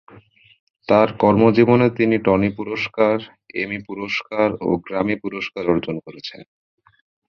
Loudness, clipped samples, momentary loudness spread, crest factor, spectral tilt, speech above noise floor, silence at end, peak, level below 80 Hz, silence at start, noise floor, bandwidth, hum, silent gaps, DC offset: -19 LUFS; under 0.1%; 15 LU; 18 dB; -8 dB/octave; 30 dB; 0.85 s; -2 dBFS; -50 dBFS; 0.15 s; -49 dBFS; 6.8 kHz; none; 0.60-0.67 s; under 0.1%